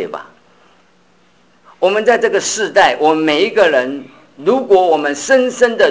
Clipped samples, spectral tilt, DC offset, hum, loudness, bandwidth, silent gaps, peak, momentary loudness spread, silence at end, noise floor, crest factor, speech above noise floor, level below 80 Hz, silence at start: under 0.1%; -2.5 dB/octave; 0.2%; none; -13 LUFS; 8 kHz; none; 0 dBFS; 9 LU; 0 s; -53 dBFS; 14 dB; 40 dB; -58 dBFS; 0 s